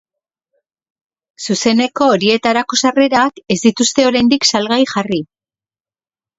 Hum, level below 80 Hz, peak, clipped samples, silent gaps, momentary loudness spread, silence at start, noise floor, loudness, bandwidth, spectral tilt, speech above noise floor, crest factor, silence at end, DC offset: none; -54 dBFS; 0 dBFS; under 0.1%; none; 8 LU; 1.4 s; under -90 dBFS; -13 LUFS; 8 kHz; -3.5 dB/octave; over 77 dB; 16 dB; 1.15 s; under 0.1%